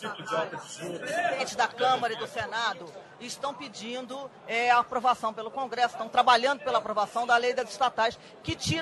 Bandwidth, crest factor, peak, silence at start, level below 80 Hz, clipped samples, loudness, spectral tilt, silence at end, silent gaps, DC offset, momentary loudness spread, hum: 12.5 kHz; 22 dB; -8 dBFS; 0 s; -60 dBFS; under 0.1%; -28 LUFS; -3 dB/octave; 0 s; none; under 0.1%; 14 LU; none